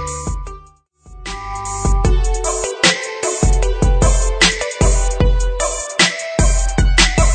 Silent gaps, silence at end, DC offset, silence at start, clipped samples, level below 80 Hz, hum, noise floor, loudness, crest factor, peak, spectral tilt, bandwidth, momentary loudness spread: none; 0 s; under 0.1%; 0 s; under 0.1%; -18 dBFS; none; -45 dBFS; -16 LUFS; 16 dB; 0 dBFS; -3.5 dB/octave; 9.4 kHz; 13 LU